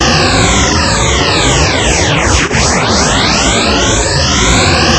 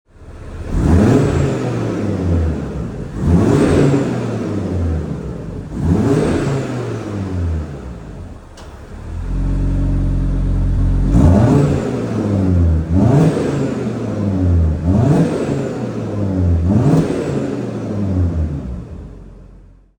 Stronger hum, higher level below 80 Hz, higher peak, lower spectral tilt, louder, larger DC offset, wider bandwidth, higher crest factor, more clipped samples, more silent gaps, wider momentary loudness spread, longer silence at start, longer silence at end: neither; first, -20 dBFS vs -26 dBFS; about the same, 0 dBFS vs 0 dBFS; second, -3 dB/octave vs -8.5 dB/octave; first, -9 LUFS vs -17 LUFS; neither; about the same, 11 kHz vs 10 kHz; about the same, 10 dB vs 14 dB; first, 0.3% vs under 0.1%; neither; second, 2 LU vs 16 LU; second, 0 s vs 0.2 s; second, 0 s vs 0.45 s